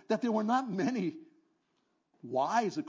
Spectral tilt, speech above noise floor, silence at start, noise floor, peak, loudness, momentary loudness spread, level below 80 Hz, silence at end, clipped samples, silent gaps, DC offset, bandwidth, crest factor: -6 dB/octave; 46 dB; 0.1 s; -77 dBFS; -16 dBFS; -32 LUFS; 7 LU; -86 dBFS; 0 s; under 0.1%; none; under 0.1%; 7.6 kHz; 18 dB